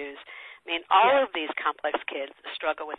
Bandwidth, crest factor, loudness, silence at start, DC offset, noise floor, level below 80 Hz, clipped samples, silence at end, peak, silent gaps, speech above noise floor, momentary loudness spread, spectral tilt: 4.6 kHz; 18 dB; -26 LUFS; 0 s; under 0.1%; -46 dBFS; -70 dBFS; under 0.1%; 0.05 s; -10 dBFS; none; 19 dB; 20 LU; -5 dB/octave